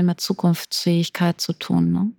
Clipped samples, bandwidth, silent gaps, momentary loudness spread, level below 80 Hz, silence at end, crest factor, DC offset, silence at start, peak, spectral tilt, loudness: under 0.1%; 18.5 kHz; none; 2 LU; -58 dBFS; 0.05 s; 16 dB; under 0.1%; 0 s; -6 dBFS; -5.5 dB/octave; -21 LUFS